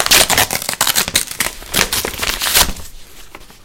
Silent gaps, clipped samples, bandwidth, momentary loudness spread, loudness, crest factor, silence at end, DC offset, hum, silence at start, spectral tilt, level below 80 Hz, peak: none; under 0.1%; over 20 kHz; 9 LU; -14 LUFS; 16 dB; 0 s; under 0.1%; none; 0 s; -0.5 dB/octave; -32 dBFS; 0 dBFS